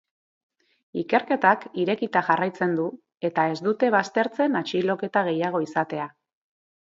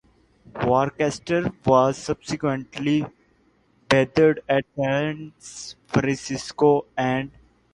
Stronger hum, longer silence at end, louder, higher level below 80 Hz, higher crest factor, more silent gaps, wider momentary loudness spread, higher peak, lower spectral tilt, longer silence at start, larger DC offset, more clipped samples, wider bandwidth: neither; first, 0.75 s vs 0.45 s; about the same, -24 LUFS vs -22 LUFS; second, -74 dBFS vs -54 dBFS; about the same, 22 dB vs 20 dB; neither; second, 10 LU vs 17 LU; about the same, -4 dBFS vs -2 dBFS; about the same, -6 dB/octave vs -6 dB/octave; first, 0.95 s vs 0.55 s; neither; neither; second, 7.8 kHz vs 11.5 kHz